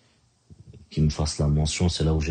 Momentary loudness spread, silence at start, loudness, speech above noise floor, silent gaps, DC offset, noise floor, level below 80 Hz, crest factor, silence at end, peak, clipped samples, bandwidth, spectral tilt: 3 LU; 0.5 s; -24 LUFS; 40 dB; none; under 0.1%; -63 dBFS; -34 dBFS; 16 dB; 0 s; -10 dBFS; under 0.1%; 9.6 kHz; -5.5 dB/octave